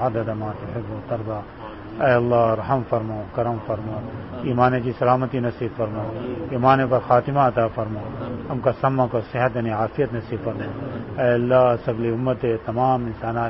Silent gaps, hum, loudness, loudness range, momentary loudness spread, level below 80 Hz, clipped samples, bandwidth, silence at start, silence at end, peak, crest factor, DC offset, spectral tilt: none; none; -22 LUFS; 3 LU; 13 LU; -46 dBFS; under 0.1%; 5.8 kHz; 0 s; 0 s; -4 dBFS; 18 dB; 0.1%; -12 dB/octave